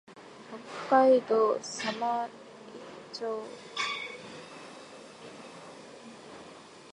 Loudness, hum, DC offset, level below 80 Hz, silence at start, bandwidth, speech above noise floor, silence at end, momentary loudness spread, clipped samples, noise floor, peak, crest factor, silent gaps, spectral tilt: -29 LUFS; none; under 0.1%; -78 dBFS; 0.1 s; 11 kHz; 23 dB; 0 s; 24 LU; under 0.1%; -50 dBFS; -10 dBFS; 22 dB; none; -3.5 dB/octave